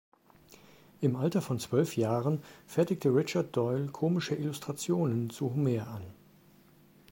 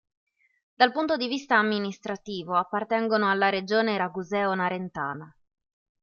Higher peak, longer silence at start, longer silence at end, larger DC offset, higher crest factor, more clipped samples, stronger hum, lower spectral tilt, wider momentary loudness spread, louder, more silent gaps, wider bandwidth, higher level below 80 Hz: second, -14 dBFS vs -4 dBFS; first, 1 s vs 0.8 s; first, 1 s vs 0.75 s; neither; second, 18 dB vs 24 dB; neither; neither; first, -7 dB/octave vs -5.5 dB/octave; second, 7 LU vs 11 LU; second, -31 LUFS vs -26 LUFS; neither; first, 16.5 kHz vs 7.2 kHz; about the same, -70 dBFS vs -70 dBFS